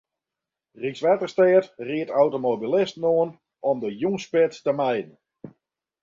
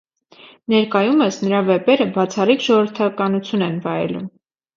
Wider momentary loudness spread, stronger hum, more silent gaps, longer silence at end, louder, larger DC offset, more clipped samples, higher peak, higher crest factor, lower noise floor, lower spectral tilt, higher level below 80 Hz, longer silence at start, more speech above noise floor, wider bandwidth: first, 11 LU vs 8 LU; neither; neither; about the same, 0.55 s vs 0.5 s; second, -23 LUFS vs -18 LUFS; neither; neither; second, -6 dBFS vs -2 dBFS; about the same, 18 dB vs 16 dB; first, -88 dBFS vs -47 dBFS; about the same, -6.5 dB/octave vs -6 dB/octave; second, -70 dBFS vs -64 dBFS; first, 0.8 s vs 0.45 s; first, 65 dB vs 30 dB; about the same, 7.6 kHz vs 7.4 kHz